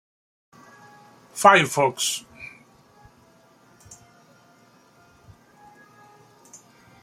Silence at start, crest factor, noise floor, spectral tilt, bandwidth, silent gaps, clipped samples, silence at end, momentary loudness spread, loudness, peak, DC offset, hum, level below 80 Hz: 1.35 s; 26 dB; -56 dBFS; -2.5 dB/octave; 16.5 kHz; none; under 0.1%; 4.55 s; 26 LU; -19 LUFS; -2 dBFS; under 0.1%; none; -68 dBFS